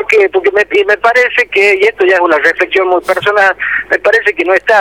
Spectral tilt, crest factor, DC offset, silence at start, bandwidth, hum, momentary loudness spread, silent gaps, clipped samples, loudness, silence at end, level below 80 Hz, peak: -3.5 dB/octave; 10 dB; 0.1%; 0 s; 16 kHz; none; 3 LU; none; under 0.1%; -9 LUFS; 0 s; -50 dBFS; 0 dBFS